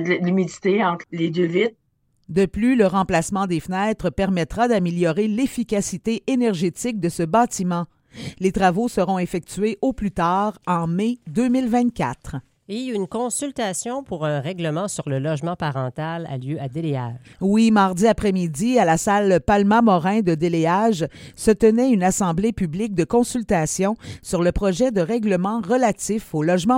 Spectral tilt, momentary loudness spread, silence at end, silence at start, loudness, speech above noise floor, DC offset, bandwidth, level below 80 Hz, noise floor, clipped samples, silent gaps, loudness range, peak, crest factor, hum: -6 dB/octave; 9 LU; 0 s; 0 s; -21 LUFS; 29 dB; under 0.1%; 16.5 kHz; -44 dBFS; -49 dBFS; under 0.1%; none; 7 LU; -2 dBFS; 18 dB; none